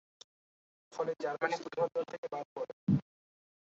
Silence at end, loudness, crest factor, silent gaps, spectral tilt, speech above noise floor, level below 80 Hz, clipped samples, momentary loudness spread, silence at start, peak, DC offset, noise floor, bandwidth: 0.75 s; -36 LUFS; 20 dB; 2.18-2.23 s, 2.45-2.56 s, 2.73-2.87 s; -6 dB/octave; over 55 dB; -68 dBFS; under 0.1%; 8 LU; 0.9 s; -18 dBFS; under 0.1%; under -90 dBFS; 7.6 kHz